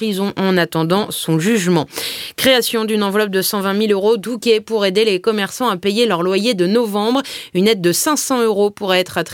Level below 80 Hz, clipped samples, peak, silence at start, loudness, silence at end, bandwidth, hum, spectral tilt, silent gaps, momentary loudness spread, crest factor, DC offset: -58 dBFS; under 0.1%; 0 dBFS; 0 s; -16 LUFS; 0 s; 17 kHz; none; -4 dB/octave; none; 4 LU; 16 dB; under 0.1%